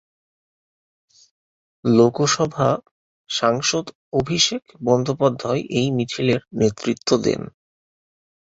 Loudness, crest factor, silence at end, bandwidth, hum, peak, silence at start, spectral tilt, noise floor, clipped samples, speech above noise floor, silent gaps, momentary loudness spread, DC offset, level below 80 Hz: -20 LUFS; 20 dB; 0.95 s; 8 kHz; none; -2 dBFS; 1.85 s; -4.5 dB/octave; under -90 dBFS; under 0.1%; over 70 dB; 2.91-3.25 s, 3.95-4.12 s; 10 LU; under 0.1%; -54 dBFS